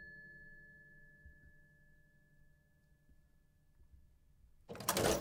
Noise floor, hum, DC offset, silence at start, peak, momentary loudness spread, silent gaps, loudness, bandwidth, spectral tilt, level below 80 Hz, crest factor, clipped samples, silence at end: -71 dBFS; none; under 0.1%; 0 s; -18 dBFS; 27 LU; none; -37 LUFS; 16 kHz; -3 dB/octave; -62 dBFS; 28 dB; under 0.1%; 0 s